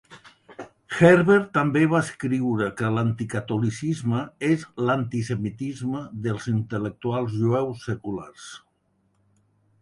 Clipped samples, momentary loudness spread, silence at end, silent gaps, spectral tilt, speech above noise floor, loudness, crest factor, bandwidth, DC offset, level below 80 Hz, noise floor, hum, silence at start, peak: under 0.1%; 14 LU; 1.25 s; none; -7 dB/octave; 45 dB; -24 LUFS; 22 dB; 11.5 kHz; under 0.1%; -58 dBFS; -68 dBFS; none; 0.1 s; -2 dBFS